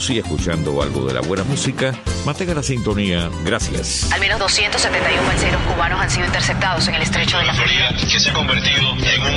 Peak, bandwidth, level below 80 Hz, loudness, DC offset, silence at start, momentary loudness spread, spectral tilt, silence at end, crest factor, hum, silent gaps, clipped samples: -4 dBFS; 11.5 kHz; -30 dBFS; -17 LUFS; under 0.1%; 0 s; 6 LU; -3.5 dB/octave; 0 s; 14 dB; none; none; under 0.1%